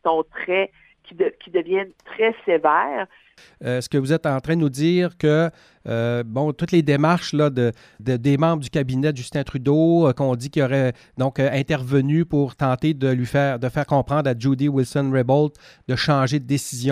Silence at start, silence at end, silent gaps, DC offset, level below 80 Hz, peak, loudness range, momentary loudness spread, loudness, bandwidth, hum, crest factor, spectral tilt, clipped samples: 0.05 s; 0 s; none; under 0.1%; -52 dBFS; -2 dBFS; 2 LU; 7 LU; -21 LUFS; 14.5 kHz; none; 18 dB; -7 dB/octave; under 0.1%